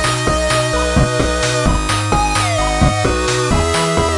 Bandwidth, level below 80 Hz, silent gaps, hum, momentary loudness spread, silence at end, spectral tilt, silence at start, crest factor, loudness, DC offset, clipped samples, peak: 11.5 kHz; -22 dBFS; none; none; 1 LU; 0 s; -4 dB/octave; 0 s; 14 dB; -15 LUFS; under 0.1%; under 0.1%; -2 dBFS